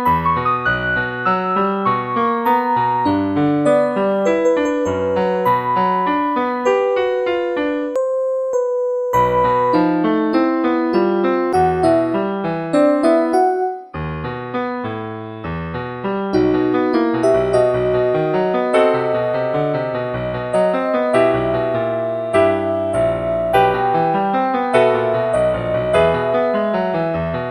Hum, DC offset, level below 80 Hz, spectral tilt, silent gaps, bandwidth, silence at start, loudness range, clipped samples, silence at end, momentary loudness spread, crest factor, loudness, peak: none; under 0.1%; -44 dBFS; -7 dB/octave; none; 15.5 kHz; 0 s; 2 LU; under 0.1%; 0 s; 7 LU; 16 dB; -17 LUFS; 0 dBFS